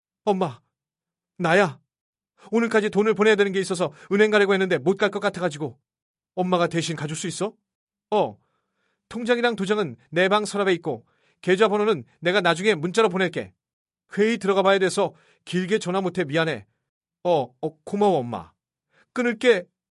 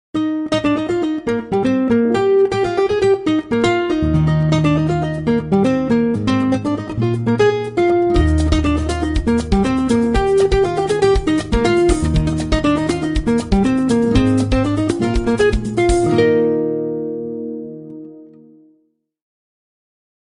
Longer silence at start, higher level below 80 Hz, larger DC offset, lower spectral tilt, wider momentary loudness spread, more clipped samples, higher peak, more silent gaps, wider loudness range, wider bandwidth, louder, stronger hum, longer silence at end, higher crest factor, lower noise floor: about the same, 0.25 s vs 0.15 s; second, -68 dBFS vs -26 dBFS; neither; second, -5 dB/octave vs -7 dB/octave; first, 12 LU vs 6 LU; neither; about the same, -4 dBFS vs -2 dBFS; first, 2.01-2.13 s, 6.02-6.14 s, 7.75-7.87 s, 13.73-13.85 s, 16.89-17.01 s vs none; about the same, 5 LU vs 3 LU; about the same, 11.5 kHz vs 10.5 kHz; second, -23 LUFS vs -16 LUFS; neither; second, 0.25 s vs 2.1 s; first, 20 dB vs 14 dB; first, -90 dBFS vs -62 dBFS